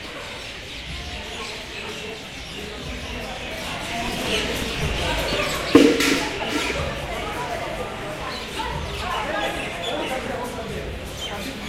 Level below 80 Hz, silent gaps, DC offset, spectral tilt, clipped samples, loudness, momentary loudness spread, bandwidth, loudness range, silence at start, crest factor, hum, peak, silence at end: -38 dBFS; none; under 0.1%; -4 dB/octave; under 0.1%; -25 LUFS; 12 LU; 16 kHz; 10 LU; 0 s; 24 dB; none; 0 dBFS; 0 s